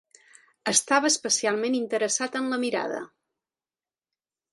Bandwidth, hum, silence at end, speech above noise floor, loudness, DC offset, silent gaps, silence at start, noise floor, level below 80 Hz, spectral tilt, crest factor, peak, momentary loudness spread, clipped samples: 12 kHz; none; 1.45 s; over 65 dB; -25 LUFS; under 0.1%; none; 0.65 s; under -90 dBFS; -76 dBFS; -1 dB/octave; 22 dB; -6 dBFS; 12 LU; under 0.1%